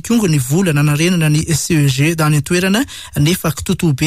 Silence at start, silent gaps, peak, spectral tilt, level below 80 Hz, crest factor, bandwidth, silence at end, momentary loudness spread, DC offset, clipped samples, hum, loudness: 0.05 s; none; -4 dBFS; -5 dB/octave; -38 dBFS; 10 dB; 16 kHz; 0 s; 4 LU; under 0.1%; under 0.1%; none; -14 LUFS